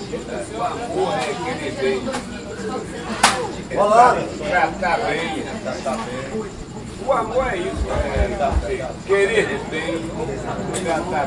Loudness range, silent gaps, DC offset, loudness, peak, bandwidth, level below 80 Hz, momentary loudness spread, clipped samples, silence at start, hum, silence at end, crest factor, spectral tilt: 5 LU; none; under 0.1%; -21 LUFS; 0 dBFS; 11.5 kHz; -34 dBFS; 11 LU; under 0.1%; 0 s; none; 0 s; 22 dB; -4.5 dB/octave